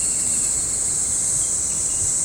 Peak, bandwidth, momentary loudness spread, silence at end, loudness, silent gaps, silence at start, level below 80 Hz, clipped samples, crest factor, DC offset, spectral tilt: -8 dBFS; 17 kHz; 1 LU; 0 s; -18 LUFS; none; 0 s; -44 dBFS; under 0.1%; 14 dB; under 0.1%; -0.5 dB/octave